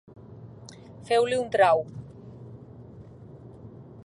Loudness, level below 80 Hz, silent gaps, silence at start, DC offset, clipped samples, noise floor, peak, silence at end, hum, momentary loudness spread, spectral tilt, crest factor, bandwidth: -23 LUFS; -60 dBFS; none; 0.25 s; under 0.1%; under 0.1%; -46 dBFS; -8 dBFS; 0.05 s; none; 25 LU; -5 dB/octave; 22 dB; 11.5 kHz